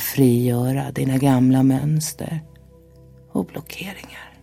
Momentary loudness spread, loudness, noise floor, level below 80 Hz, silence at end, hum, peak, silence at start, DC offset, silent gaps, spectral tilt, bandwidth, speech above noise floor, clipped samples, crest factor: 16 LU; -20 LUFS; -47 dBFS; -50 dBFS; 0.15 s; none; -4 dBFS; 0 s; under 0.1%; none; -6.5 dB/octave; 16.5 kHz; 28 dB; under 0.1%; 18 dB